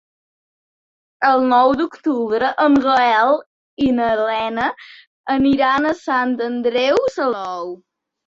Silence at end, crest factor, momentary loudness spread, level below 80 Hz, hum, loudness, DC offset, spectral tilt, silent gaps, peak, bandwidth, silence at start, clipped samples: 0.55 s; 14 dB; 10 LU; -54 dBFS; none; -17 LUFS; under 0.1%; -5 dB/octave; 3.46-3.77 s, 5.07-5.24 s; -4 dBFS; 7.6 kHz; 1.2 s; under 0.1%